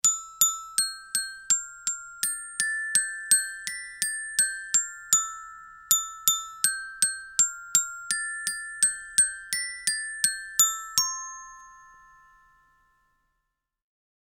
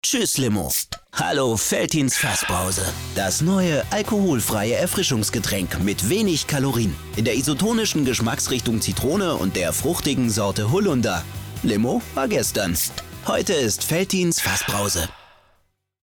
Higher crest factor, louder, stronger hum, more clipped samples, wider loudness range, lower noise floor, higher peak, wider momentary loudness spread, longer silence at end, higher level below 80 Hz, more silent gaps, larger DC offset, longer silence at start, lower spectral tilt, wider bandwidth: first, 28 dB vs 12 dB; second, -25 LUFS vs -21 LUFS; neither; neither; about the same, 3 LU vs 1 LU; first, -81 dBFS vs -65 dBFS; first, 0 dBFS vs -10 dBFS; first, 9 LU vs 4 LU; first, 2.4 s vs 0.8 s; second, -64 dBFS vs -42 dBFS; neither; neither; about the same, 0.05 s vs 0.05 s; second, 4 dB/octave vs -4 dB/octave; about the same, over 20 kHz vs over 20 kHz